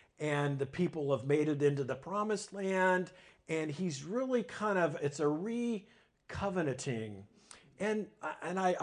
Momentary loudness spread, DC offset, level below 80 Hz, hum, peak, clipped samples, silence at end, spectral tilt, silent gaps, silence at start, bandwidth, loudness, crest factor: 8 LU; under 0.1%; -66 dBFS; none; -18 dBFS; under 0.1%; 0 s; -6 dB/octave; none; 0.2 s; 10 kHz; -35 LUFS; 18 dB